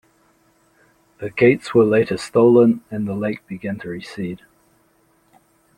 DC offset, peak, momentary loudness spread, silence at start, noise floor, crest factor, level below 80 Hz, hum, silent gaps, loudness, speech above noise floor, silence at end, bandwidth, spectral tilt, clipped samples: under 0.1%; -2 dBFS; 16 LU; 1.2 s; -60 dBFS; 18 dB; -58 dBFS; none; none; -18 LUFS; 42 dB; 1.4 s; 11 kHz; -7 dB/octave; under 0.1%